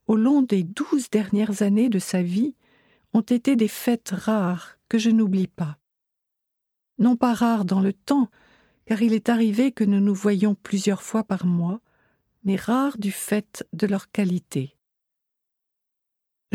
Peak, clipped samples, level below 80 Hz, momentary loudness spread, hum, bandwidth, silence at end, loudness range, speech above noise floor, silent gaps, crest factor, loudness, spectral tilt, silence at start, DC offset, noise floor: -6 dBFS; under 0.1%; -66 dBFS; 8 LU; none; 16 kHz; 1.9 s; 4 LU; 60 dB; none; 18 dB; -23 LUFS; -6.5 dB/octave; 0.1 s; under 0.1%; -82 dBFS